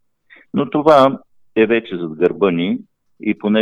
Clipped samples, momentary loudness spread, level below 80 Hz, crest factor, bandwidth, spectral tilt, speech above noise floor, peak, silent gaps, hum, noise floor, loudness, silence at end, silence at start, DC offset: under 0.1%; 14 LU; -58 dBFS; 16 dB; 10.5 kHz; -7.5 dB/octave; 35 dB; 0 dBFS; none; none; -50 dBFS; -17 LUFS; 0 s; 0.55 s; under 0.1%